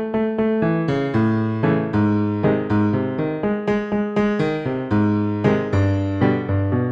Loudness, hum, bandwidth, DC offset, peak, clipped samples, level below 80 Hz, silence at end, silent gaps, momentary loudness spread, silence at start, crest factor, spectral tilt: -20 LUFS; none; 7.4 kHz; under 0.1%; -4 dBFS; under 0.1%; -46 dBFS; 0 s; none; 3 LU; 0 s; 16 dB; -9 dB/octave